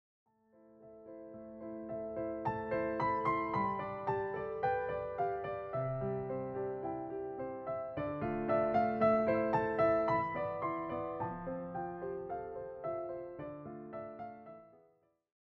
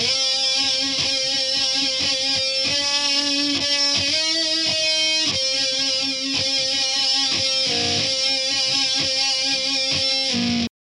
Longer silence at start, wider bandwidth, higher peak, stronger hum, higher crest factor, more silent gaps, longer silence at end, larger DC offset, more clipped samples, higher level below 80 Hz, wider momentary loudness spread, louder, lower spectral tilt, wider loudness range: first, 0.65 s vs 0 s; second, 5.8 kHz vs 13.5 kHz; second, -18 dBFS vs -8 dBFS; neither; about the same, 18 dB vs 14 dB; neither; first, 0.75 s vs 0.1 s; neither; neither; about the same, -62 dBFS vs -58 dBFS; first, 16 LU vs 2 LU; second, -37 LUFS vs -18 LUFS; first, -9.5 dB/octave vs -1 dB/octave; first, 10 LU vs 1 LU